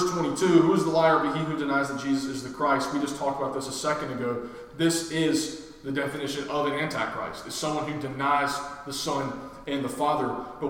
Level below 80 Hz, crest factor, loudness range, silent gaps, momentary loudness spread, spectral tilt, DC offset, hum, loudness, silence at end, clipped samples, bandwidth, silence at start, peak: -58 dBFS; 20 dB; 5 LU; none; 12 LU; -4.5 dB/octave; under 0.1%; none; -27 LUFS; 0 s; under 0.1%; 17 kHz; 0 s; -6 dBFS